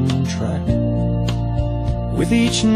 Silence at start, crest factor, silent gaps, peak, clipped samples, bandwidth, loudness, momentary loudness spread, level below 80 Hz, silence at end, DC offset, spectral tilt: 0 s; 12 dB; none; -6 dBFS; under 0.1%; 12.5 kHz; -20 LUFS; 6 LU; -28 dBFS; 0 s; under 0.1%; -6 dB/octave